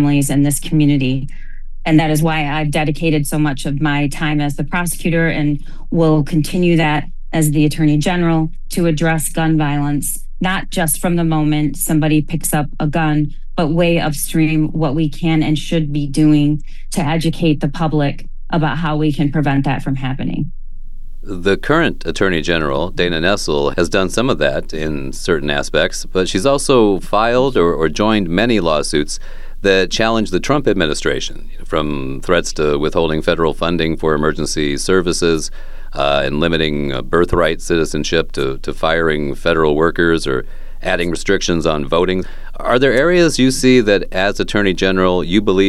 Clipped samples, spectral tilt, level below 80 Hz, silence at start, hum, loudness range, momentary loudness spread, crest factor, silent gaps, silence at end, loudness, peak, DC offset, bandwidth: under 0.1%; -5.5 dB/octave; -26 dBFS; 0 s; none; 3 LU; 8 LU; 14 dB; none; 0 s; -16 LUFS; 0 dBFS; under 0.1%; 13 kHz